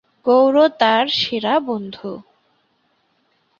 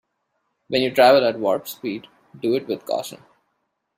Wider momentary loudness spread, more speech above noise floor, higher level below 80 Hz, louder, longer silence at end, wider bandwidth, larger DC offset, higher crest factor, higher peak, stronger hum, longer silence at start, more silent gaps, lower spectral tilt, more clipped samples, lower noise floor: about the same, 17 LU vs 16 LU; second, 48 dB vs 54 dB; about the same, -64 dBFS vs -66 dBFS; first, -16 LUFS vs -20 LUFS; first, 1.4 s vs 0.8 s; second, 7.2 kHz vs 16 kHz; neither; about the same, 18 dB vs 20 dB; about the same, -2 dBFS vs -2 dBFS; neither; second, 0.25 s vs 0.7 s; neither; about the same, -5 dB/octave vs -4.5 dB/octave; neither; second, -64 dBFS vs -74 dBFS